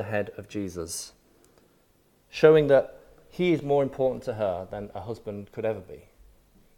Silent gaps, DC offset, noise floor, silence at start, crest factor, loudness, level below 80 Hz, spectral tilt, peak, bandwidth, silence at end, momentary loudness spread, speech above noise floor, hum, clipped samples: none; under 0.1%; -64 dBFS; 0 s; 22 dB; -26 LUFS; -58 dBFS; -6 dB/octave; -6 dBFS; 16.5 kHz; 0.8 s; 19 LU; 38 dB; none; under 0.1%